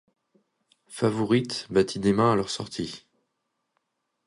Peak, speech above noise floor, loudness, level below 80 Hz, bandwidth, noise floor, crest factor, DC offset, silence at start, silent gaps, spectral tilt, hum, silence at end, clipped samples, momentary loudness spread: -8 dBFS; 54 dB; -25 LUFS; -58 dBFS; 11.5 kHz; -79 dBFS; 18 dB; under 0.1%; 0.9 s; none; -5.5 dB/octave; none; 1.3 s; under 0.1%; 13 LU